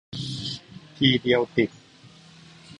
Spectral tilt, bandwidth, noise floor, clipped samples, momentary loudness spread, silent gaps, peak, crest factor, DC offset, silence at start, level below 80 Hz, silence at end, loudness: -5.5 dB/octave; 11 kHz; -51 dBFS; under 0.1%; 12 LU; none; -4 dBFS; 22 dB; under 0.1%; 0.1 s; -58 dBFS; 0.05 s; -24 LUFS